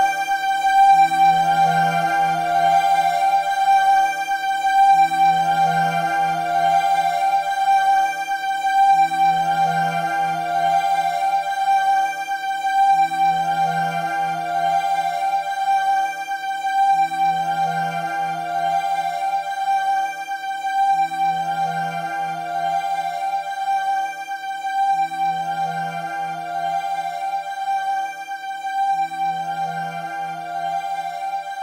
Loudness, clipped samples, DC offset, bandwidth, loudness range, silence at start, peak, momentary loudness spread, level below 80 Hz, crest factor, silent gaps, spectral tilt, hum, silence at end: -20 LUFS; under 0.1%; under 0.1%; 16 kHz; 7 LU; 0 s; -6 dBFS; 10 LU; -64 dBFS; 14 dB; none; -3.5 dB/octave; none; 0 s